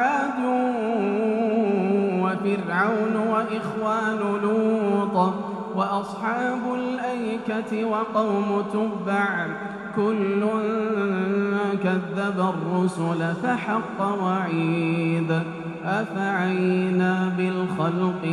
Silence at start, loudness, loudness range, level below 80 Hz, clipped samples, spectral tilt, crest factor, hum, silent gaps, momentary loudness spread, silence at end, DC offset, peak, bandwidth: 0 s; -24 LUFS; 2 LU; -66 dBFS; under 0.1%; -7.5 dB/octave; 16 dB; none; none; 5 LU; 0 s; under 0.1%; -6 dBFS; 11 kHz